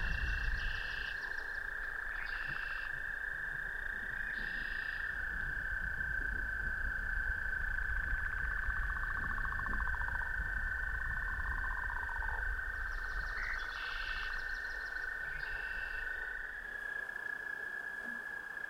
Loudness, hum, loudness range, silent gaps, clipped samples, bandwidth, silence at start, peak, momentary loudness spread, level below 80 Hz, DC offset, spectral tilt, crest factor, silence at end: -38 LUFS; none; 3 LU; none; under 0.1%; 16.5 kHz; 0 s; -22 dBFS; 3 LU; -44 dBFS; under 0.1%; -4 dB/octave; 16 dB; 0 s